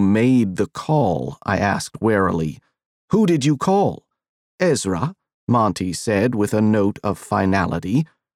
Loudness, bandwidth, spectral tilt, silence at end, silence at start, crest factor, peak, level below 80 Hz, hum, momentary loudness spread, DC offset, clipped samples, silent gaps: -20 LUFS; 14 kHz; -6.5 dB/octave; 0.3 s; 0 s; 16 dB; -4 dBFS; -50 dBFS; none; 8 LU; under 0.1%; under 0.1%; 2.86-3.08 s, 4.29-4.58 s, 5.34-5.47 s